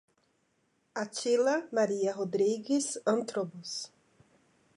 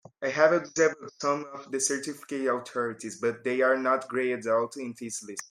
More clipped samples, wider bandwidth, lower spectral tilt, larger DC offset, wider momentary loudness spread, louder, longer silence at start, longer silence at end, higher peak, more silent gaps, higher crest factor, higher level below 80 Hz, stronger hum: neither; second, 11.5 kHz vs 16 kHz; about the same, -4 dB/octave vs -3.5 dB/octave; neither; about the same, 11 LU vs 12 LU; second, -31 LUFS vs -28 LUFS; first, 0.95 s vs 0.2 s; first, 0.9 s vs 0.05 s; second, -16 dBFS vs -8 dBFS; neither; second, 16 dB vs 22 dB; second, -84 dBFS vs -78 dBFS; neither